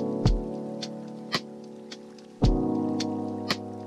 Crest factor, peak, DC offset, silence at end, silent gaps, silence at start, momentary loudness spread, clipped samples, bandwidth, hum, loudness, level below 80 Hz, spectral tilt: 16 dB; -12 dBFS; under 0.1%; 0 s; none; 0 s; 17 LU; under 0.1%; 13 kHz; none; -29 LUFS; -36 dBFS; -6 dB/octave